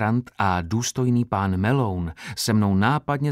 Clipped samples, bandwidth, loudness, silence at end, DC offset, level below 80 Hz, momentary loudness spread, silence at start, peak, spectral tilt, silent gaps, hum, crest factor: under 0.1%; 16 kHz; -23 LUFS; 0 s; under 0.1%; -48 dBFS; 6 LU; 0 s; -6 dBFS; -5.5 dB/octave; none; none; 16 dB